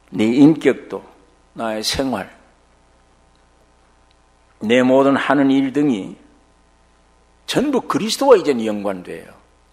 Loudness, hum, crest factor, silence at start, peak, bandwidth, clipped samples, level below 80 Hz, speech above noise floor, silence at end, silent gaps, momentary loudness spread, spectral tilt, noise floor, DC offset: -17 LUFS; none; 20 dB; 0.1 s; 0 dBFS; 15 kHz; under 0.1%; -52 dBFS; 38 dB; 0.5 s; none; 20 LU; -5 dB/octave; -54 dBFS; under 0.1%